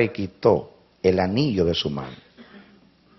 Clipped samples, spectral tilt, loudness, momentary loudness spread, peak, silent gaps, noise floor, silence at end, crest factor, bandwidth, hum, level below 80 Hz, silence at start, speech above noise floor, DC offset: under 0.1%; -5 dB/octave; -23 LUFS; 9 LU; -4 dBFS; none; -55 dBFS; 0.6 s; 20 dB; 6.2 kHz; none; -50 dBFS; 0 s; 33 dB; under 0.1%